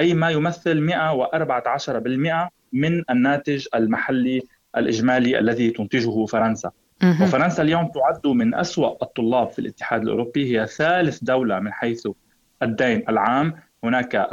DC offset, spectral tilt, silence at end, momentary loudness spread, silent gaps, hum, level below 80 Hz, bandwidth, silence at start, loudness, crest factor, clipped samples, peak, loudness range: under 0.1%; -6.5 dB/octave; 0 s; 7 LU; none; none; -58 dBFS; 7.6 kHz; 0 s; -21 LUFS; 16 dB; under 0.1%; -4 dBFS; 2 LU